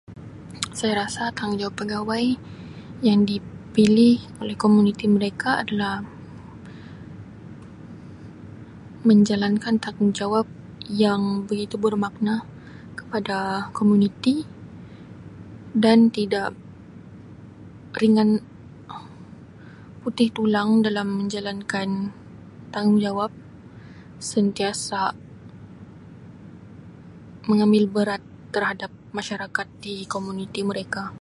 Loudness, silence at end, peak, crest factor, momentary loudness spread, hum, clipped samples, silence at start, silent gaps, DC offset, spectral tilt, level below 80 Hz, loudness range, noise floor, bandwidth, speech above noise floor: -22 LUFS; 0.05 s; -2 dBFS; 20 dB; 25 LU; none; under 0.1%; 0.1 s; none; under 0.1%; -6 dB/octave; -56 dBFS; 7 LU; -43 dBFS; 11.5 kHz; 22 dB